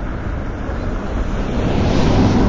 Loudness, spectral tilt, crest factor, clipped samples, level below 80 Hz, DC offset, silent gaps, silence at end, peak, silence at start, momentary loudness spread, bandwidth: -20 LUFS; -7 dB/octave; 14 dB; under 0.1%; -22 dBFS; under 0.1%; none; 0 s; -2 dBFS; 0 s; 10 LU; 7.6 kHz